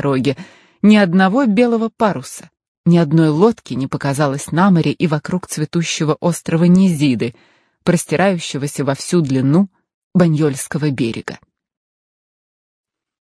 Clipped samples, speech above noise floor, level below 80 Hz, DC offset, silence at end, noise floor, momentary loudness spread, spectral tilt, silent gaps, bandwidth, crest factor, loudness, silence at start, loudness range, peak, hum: under 0.1%; over 75 dB; -54 dBFS; under 0.1%; 1.85 s; under -90 dBFS; 10 LU; -6.5 dB/octave; 2.68-2.84 s, 9.94-10.11 s; 11 kHz; 16 dB; -16 LUFS; 0 s; 4 LU; 0 dBFS; none